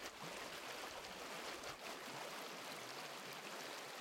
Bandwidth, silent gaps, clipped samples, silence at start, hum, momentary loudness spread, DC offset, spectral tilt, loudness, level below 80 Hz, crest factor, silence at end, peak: 16.5 kHz; none; under 0.1%; 0 s; none; 1 LU; under 0.1%; -1.5 dB/octave; -49 LUFS; -80 dBFS; 16 dB; 0 s; -34 dBFS